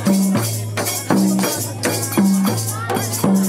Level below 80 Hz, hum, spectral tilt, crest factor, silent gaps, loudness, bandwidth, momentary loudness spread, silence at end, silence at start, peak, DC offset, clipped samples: -60 dBFS; none; -5 dB/octave; 16 dB; none; -18 LUFS; 16.5 kHz; 5 LU; 0 s; 0 s; -2 dBFS; under 0.1%; under 0.1%